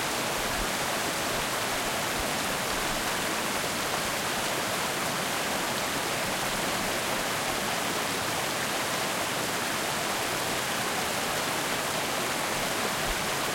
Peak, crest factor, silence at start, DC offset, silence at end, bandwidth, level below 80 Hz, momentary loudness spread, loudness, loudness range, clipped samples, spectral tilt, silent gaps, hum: -16 dBFS; 14 dB; 0 s; under 0.1%; 0 s; 16.5 kHz; -50 dBFS; 0 LU; -28 LUFS; 0 LU; under 0.1%; -2 dB/octave; none; none